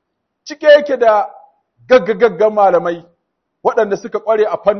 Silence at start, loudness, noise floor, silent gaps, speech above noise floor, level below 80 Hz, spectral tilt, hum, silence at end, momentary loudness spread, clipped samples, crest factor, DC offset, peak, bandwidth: 0.45 s; -13 LUFS; -70 dBFS; none; 58 dB; -56 dBFS; -5 dB/octave; none; 0 s; 11 LU; under 0.1%; 14 dB; under 0.1%; 0 dBFS; 6.4 kHz